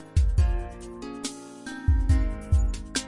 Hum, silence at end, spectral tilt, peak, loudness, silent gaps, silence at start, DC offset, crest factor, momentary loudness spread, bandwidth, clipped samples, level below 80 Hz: none; 0 s; -5.5 dB/octave; -10 dBFS; -27 LUFS; none; 0 s; under 0.1%; 14 dB; 15 LU; 11.5 kHz; under 0.1%; -26 dBFS